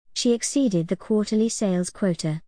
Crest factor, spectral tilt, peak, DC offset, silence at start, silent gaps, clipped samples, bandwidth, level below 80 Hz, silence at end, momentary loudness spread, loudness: 14 dB; -5 dB/octave; -10 dBFS; 0.3%; 0.15 s; none; under 0.1%; 10.5 kHz; -58 dBFS; 0.1 s; 3 LU; -23 LUFS